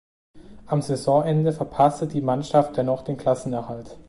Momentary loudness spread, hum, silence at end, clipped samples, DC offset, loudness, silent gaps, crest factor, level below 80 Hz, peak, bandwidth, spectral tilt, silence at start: 7 LU; none; 0.05 s; under 0.1%; under 0.1%; -23 LUFS; none; 18 dB; -54 dBFS; -6 dBFS; 11.5 kHz; -7.5 dB/octave; 0.35 s